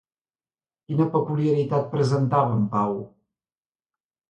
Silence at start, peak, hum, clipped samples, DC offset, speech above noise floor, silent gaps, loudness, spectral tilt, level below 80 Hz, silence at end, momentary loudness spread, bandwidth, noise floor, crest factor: 0.9 s; -8 dBFS; none; under 0.1%; under 0.1%; over 68 dB; none; -23 LUFS; -8.5 dB/octave; -62 dBFS; 1.25 s; 7 LU; 9.4 kHz; under -90 dBFS; 18 dB